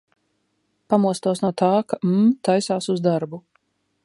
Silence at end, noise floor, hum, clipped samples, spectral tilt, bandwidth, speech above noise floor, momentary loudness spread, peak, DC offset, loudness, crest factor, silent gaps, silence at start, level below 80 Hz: 0.65 s; -70 dBFS; none; under 0.1%; -6.5 dB/octave; 11.5 kHz; 51 dB; 6 LU; -4 dBFS; under 0.1%; -21 LUFS; 18 dB; none; 0.9 s; -70 dBFS